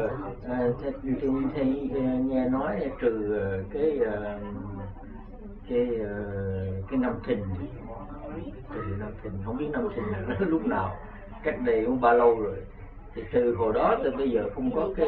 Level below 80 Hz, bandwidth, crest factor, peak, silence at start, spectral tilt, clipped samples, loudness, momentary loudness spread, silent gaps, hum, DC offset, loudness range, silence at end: -44 dBFS; 4.4 kHz; 20 dB; -8 dBFS; 0 s; -10.5 dB/octave; under 0.1%; -28 LUFS; 16 LU; none; none; under 0.1%; 7 LU; 0 s